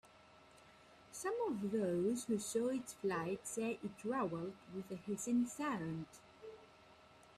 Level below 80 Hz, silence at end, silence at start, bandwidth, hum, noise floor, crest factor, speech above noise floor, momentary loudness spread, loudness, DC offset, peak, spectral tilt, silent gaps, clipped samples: -76 dBFS; 0.05 s; 0.05 s; 14.5 kHz; none; -64 dBFS; 16 dB; 24 dB; 17 LU; -41 LUFS; under 0.1%; -26 dBFS; -5.5 dB/octave; none; under 0.1%